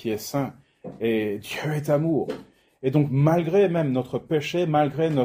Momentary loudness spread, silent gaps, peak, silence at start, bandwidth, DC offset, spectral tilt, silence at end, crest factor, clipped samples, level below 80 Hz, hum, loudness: 11 LU; none; -6 dBFS; 0 s; 16 kHz; under 0.1%; -7 dB/octave; 0 s; 16 dB; under 0.1%; -60 dBFS; none; -24 LUFS